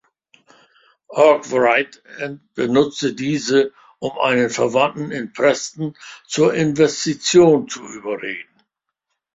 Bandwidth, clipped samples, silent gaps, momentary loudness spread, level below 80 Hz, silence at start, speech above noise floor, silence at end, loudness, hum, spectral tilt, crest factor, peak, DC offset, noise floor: 8 kHz; under 0.1%; none; 15 LU; -60 dBFS; 1.1 s; 59 dB; 0.9 s; -18 LUFS; none; -4.5 dB/octave; 18 dB; 0 dBFS; under 0.1%; -77 dBFS